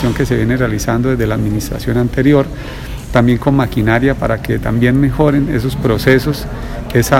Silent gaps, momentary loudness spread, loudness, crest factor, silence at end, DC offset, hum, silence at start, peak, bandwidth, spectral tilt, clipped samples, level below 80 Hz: none; 8 LU; -14 LUFS; 14 dB; 0 s; under 0.1%; none; 0 s; 0 dBFS; 16.5 kHz; -6.5 dB/octave; 0.3%; -26 dBFS